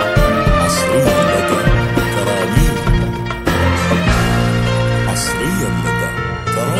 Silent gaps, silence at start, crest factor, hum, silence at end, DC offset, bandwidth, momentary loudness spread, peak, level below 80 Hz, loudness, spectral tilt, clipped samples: none; 0 s; 14 dB; none; 0 s; under 0.1%; 16 kHz; 5 LU; 0 dBFS; -22 dBFS; -15 LUFS; -5.5 dB/octave; under 0.1%